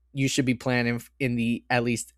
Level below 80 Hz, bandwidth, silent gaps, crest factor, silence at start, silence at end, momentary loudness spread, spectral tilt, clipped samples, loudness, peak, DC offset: -54 dBFS; 15 kHz; none; 20 dB; 0.15 s; 0.15 s; 4 LU; -5 dB/octave; under 0.1%; -26 LUFS; -8 dBFS; under 0.1%